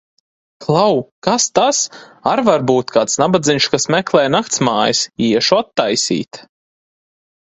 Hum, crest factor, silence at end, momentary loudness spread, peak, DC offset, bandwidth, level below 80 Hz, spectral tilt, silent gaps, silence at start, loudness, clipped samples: none; 16 dB; 1 s; 5 LU; 0 dBFS; under 0.1%; 8.4 kHz; -56 dBFS; -3.5 dB/octave; 1.11-1.22 s; 0.6 s; -15 LUFS; under 0.1%